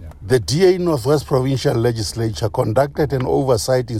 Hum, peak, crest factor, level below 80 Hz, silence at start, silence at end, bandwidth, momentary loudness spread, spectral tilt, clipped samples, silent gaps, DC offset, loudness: none; -4 dBFS; 14 dB; -38 dBFS; 0 s; 0 s; 15.5 kHz; 6 LU; -6 dB/octave; under 0.1%; none; under 0.1%; -18 LUFS